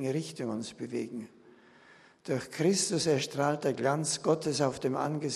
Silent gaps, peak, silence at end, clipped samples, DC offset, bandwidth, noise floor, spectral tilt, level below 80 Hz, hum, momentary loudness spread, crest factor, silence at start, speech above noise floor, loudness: none; -12 dBFS; 0 s; under 0.1%; under 0.1%; 13 kHz; -58 dBFS; -4.5 dB/octave; -72 dBFS; none; 10 LU; 18 dB; 0 s; 28 dB; -31 LUFS